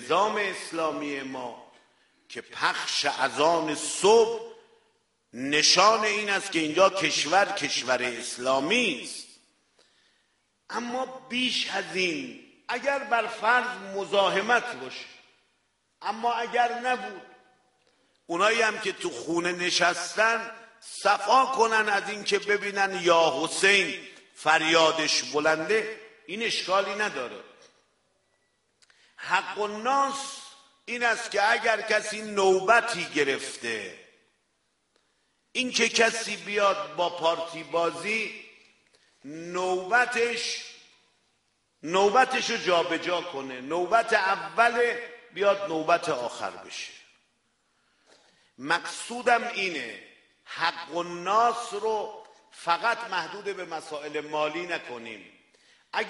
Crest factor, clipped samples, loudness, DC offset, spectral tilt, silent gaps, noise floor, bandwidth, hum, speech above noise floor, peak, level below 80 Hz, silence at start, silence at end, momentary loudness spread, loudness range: 22 dB; under 0.1%; -25 LUFS; under 0.1%; -2 dB/octave; none; -74 dBFS; 11.5 kHz; none; 48 dB; -6 dBFS; -74 dBFS; 0 s; 0 s; 16 LU; 8 LU